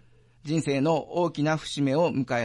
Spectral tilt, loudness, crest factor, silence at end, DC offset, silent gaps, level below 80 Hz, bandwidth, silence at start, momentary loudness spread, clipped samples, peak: -6 dB/octave; -26 LUFS; 14 dB; 0 s; under 0.1%; none; -62 dBFS; 11 kHz; 0.45 s; 5 LU; under 0.1%; -12 dBFS